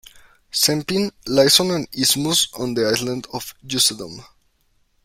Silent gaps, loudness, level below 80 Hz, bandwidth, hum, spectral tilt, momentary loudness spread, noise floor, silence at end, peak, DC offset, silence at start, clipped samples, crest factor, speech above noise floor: none; -18 LUFS; -54 dBFS; 16.5 kHz; none; -2.5 dB/octave; 15 LU; -63 dBFS; 0.8 s; -2 dBFS; under 0.1%; 0.15 s; under 0.1%; 20 dB; 43 dB